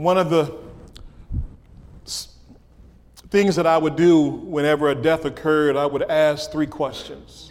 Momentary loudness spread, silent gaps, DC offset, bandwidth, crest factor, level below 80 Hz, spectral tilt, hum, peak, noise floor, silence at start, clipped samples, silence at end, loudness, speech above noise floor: 16 LU; none; under 0.1%; 15.5 kHz; 16 dB; -42 dBFS; -6 dB/octave; none; -6 dBFS; -48 dBFS; 0 s; under 0.1%; 0.05 s; -20 LUFS; 29 dB